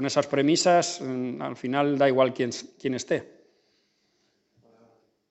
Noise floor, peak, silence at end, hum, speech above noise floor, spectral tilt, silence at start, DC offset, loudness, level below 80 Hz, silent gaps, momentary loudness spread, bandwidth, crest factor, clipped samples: -71 dBFS; -6 dBFS; 2.05 s; none; 46 dB; -4.5 dB/octave; 0 s; under 0.1%; -25 LUFS; -76 dBFS; none; 11 LU; 8.4 kHz; 20 dB; under 0.1%